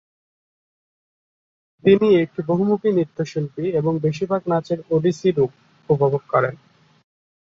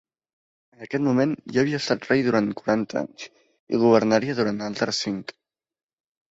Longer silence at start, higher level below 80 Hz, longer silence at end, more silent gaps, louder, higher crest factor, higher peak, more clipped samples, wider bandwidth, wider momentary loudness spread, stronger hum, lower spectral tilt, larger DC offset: first, 1.85 s vs 0.8 s; about the same, -60 dBFS vs -64 dBFS; about the same, 0.9 s vs 1 s; second, none vs 3.60-3.67 s; first, -20 LUFS vs -23 LUFS; about the same, 18 dB vs 20 dB; about the same, -2 dBFS vs -4 dBFS; neither; about the same, 7.6 kHz vs 8 kHz; second, 8 LU vs 13 LU; neither; first, -8 dB/octave vs -5.5 dB/octave; neither